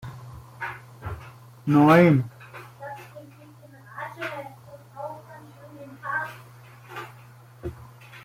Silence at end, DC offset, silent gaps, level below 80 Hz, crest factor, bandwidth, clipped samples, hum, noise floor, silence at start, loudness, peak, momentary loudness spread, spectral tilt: 0.05 s; under 0.1%; none; -56 dBFS; 24 dB; 16 kHz; under 0.1%; none; -48 dBFS; 0.05 s; -22 LUFS; -4 dBFS; 27 LU; -8 dB/octave